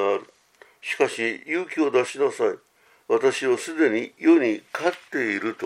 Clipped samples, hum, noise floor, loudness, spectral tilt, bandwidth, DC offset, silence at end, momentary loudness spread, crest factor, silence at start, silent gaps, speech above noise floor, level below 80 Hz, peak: under 0.1%; none; -55 dBFS; -23 LUFS; -4 dB/octave; 13 kHz; under 0.1%; 0 s; 8 LU; 18 dB; 0 s; none; 32 dB; -80 dBFS; -6 dBFS